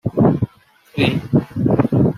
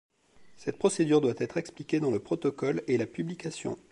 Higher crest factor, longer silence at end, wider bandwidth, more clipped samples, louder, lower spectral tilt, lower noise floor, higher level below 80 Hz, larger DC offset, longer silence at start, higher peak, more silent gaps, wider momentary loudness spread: about the same, 16 dB vs 18 dB; second, 0 s vs 0.15 s; first, 13.5 kHz vs 11 kHz; neither; first, -18 LUFS vs -30 LUFS; first, -8.5 dB/octave vs -6 dB/octave; second, -49 dBFS vs -57 dBFS; first, -44 dBFS vs -68 dBFS; neither; second, 0.05 s vs 0.4 s; first, -2 dBFS vs -12 dBFS; neither; second, 8 LU vs 11 LU